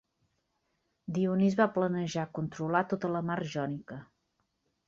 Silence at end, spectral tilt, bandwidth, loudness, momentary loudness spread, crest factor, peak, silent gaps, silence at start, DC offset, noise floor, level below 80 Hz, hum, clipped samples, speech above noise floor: 0.85 s; -7 dB/octave; 7.6 kHz; -31 LUFS; 14 LU; 20 dB; -12 dBFS; none; 1.1 s; under 0.1%; -79 dBFS; -70 dBFS; none; under 0.1%; 48 dB